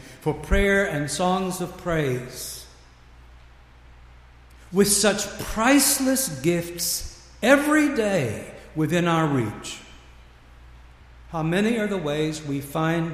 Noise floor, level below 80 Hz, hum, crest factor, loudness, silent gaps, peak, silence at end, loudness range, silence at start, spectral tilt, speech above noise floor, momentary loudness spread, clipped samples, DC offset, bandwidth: -49 dBFS; -40 dBFS; none; 20 dB; -23 LUFS; none; -4 dBFS; 0 s; 7 LU; 0 s; -4 dB/octave; 27 dB; 15 LU; under 0.1%; under 0.1%; 15.5 kHz